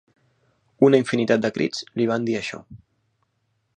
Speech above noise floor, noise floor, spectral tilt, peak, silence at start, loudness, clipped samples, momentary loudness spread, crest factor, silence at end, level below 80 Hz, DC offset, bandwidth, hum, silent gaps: 50 dB; -71 dBFS; -6 dB/octave; -4 dBFS; 0.8 s; -21 LUFS; under 0.1%; 10 LU; 20 dB; 1 s; -64 dBFS; under 0.1%; 9.8 kHz; none; none